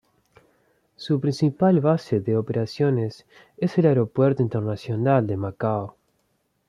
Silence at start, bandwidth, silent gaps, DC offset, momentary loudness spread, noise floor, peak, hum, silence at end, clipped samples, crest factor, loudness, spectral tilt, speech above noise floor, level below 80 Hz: 1 s; 10.5 kHz; none; under 0.1%; 8 LU; -70 dBFS; -6 dBFS; none; 0.8 s; under 0.1%; 18 dB; -23 LUFS; -8.5 dB/octave; 48 dB; -62 dBFS